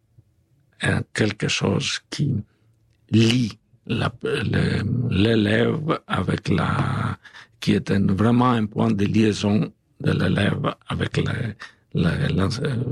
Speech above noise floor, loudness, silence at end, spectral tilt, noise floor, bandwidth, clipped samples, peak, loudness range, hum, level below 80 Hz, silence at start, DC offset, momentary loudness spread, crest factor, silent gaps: 41 dB; -22 LUFS; 0 s; -6 dB/octave; -62 dBFS; 12 kHz; under 0.1%; -8 dBFS; 3 LU; none; -50 dBFS; 0.8 s; under 0.1%; 9 LU; 14 dB; none